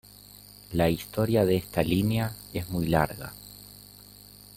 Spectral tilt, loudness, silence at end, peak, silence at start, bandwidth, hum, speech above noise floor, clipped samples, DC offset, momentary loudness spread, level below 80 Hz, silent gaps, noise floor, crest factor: -6.5 dB/octave; -27 LUFS; 0.8 s; -8 dBFS; 0.7 s; 17 kHz; 50 Hz at -45 dBFS; 24 dB; under 0.1%; under 0.1%; 23 LU; -50 dBFS; none; -50 dBFS; 22 dB